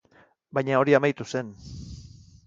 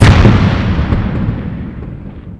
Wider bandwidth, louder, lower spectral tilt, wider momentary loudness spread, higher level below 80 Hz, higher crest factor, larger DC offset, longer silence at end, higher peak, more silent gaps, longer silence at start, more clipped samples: second, 7.6 kHz vs 11 kHz; second, -24 LUFS vs -12 LUFS; about the same, -6.5 dB/octave vs -7 dB/octave; first, 22 LU vs 19 LU; second, -52 dBFS vs -18 dBFS; first, 22 dB vs 12 dB; neither; first, 0.4 s vs 0 s; second, -6 dBFS vs 0 dBFS; neither; first, 0.55 s vs 0 s; second, under 0.1% vs 0.8%